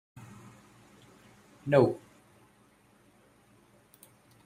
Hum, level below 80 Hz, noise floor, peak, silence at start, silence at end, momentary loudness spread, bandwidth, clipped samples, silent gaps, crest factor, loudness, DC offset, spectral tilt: none; -70 dBFS; -63 dBFS; -8 dBFS; 1.65 s; 2.5 s; 28 LU; 15.5 kHz; under 0.1%; none; 26 dB; -28 LUFS; under 0.1%; -8 dB/octave